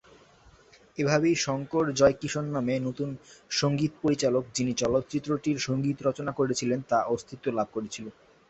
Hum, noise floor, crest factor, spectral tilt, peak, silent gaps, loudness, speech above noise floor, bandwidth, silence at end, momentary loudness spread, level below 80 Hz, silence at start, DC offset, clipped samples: none; -57 dBFS; 20 dB; -5 dB/octave; -8 dBFS; none; -28 LUFS; 30 dB; 8.4 kHz; 0.4 s; 10 LU; -58 dBFS; 0.95 s; under 0.1%; under 0.1%